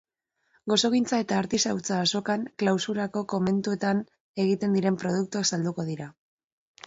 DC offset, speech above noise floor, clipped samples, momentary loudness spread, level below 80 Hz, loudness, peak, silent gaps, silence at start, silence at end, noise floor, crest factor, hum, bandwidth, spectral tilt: under 0.1%; 47 dB; under 0.1%; 7 LU; -66 dBFS; -26 LUFS; -10 dBFS; 4.20-4.34 s; 0.65 s; 0.75 s; -73 dBFS; 16 dB; none; 8 kHz; -4.5 dB/octave